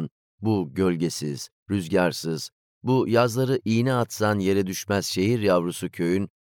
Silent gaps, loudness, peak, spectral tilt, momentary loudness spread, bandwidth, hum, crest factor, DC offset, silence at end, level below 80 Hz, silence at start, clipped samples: 0.11-0.38 s, 1.52-1.66 s, 2.52-2.81 s; -24 LUFS; -8 dBFS; -5.5 dB/octave; 10 LU; 19 kHz; none; 16 dB; under 0.1%; 0.15 s; -66 dBFS; 0 s; under 0.1%